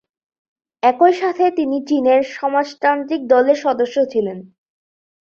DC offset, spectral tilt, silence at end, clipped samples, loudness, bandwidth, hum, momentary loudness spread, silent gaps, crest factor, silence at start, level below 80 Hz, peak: under 0.1%; -5.5 dB/octave; 0.8 s; under 0.1%; -17 LUFS; 7 kHz; none; 7 LU; none; 16 dB; 0.85 s; -66 dBFS; -2 dBFS